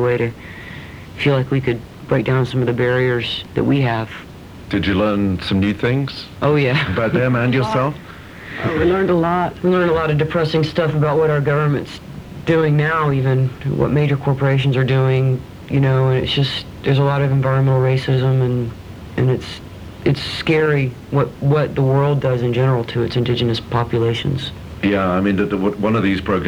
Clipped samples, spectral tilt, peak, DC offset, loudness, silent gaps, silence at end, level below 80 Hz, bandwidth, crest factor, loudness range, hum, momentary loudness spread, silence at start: under 0.1%; -8 dB/octave; -4 dBFS; under 0.1%; -18 LUFS; none; 0 s; -42 dBFS; 9.8 kHz; 14 dB; 2 LU; none; 11 LU; 0 s